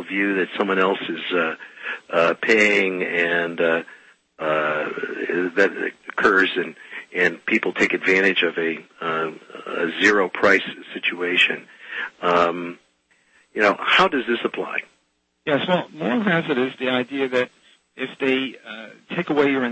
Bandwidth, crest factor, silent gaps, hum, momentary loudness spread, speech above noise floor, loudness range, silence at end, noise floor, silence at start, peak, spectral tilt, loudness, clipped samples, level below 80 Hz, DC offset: 8.6 kHz; 18 dB; none; none; 14 LU; 47 dB; 3 LU; 0 s; -69 dBFS; 0 s; -4 dBFS; -4.5 dB/octave; -21 LUFS; under 0.1%; -64 dBFS; under 0.1%